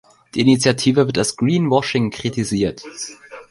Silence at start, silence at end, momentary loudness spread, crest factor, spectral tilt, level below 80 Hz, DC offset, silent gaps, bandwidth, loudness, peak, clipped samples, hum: 0.35 s; 0.1 s; 15 LU; 16 dB; -5 dB/octave; -50 dBFS; under 0.1%; none; 11.5 kHz; -18 LUFS; -2 dBFS; under 0.1%; none